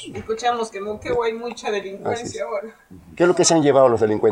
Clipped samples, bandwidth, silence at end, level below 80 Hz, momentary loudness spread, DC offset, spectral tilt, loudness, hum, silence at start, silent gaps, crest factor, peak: under 0.1%; 11.5 kHz; 0 s; -54 dBFS; 13 LU; under 0.1%; -4 dB/octave; -20 LUFS; none; 0 s; none; 18 dB; -2 dBFS